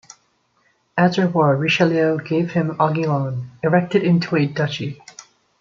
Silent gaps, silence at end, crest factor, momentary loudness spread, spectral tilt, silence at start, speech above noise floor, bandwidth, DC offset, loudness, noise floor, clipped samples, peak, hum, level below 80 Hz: none; 0.4 s; 18 dB; 9 LU; -7 dB/octave; 0.95 s; 45 dB; 7.4 kHz; under 0.1%; -19 LUFS; -63 dBFS; under 0.1%; -2 dBFS; none; -62 dBFS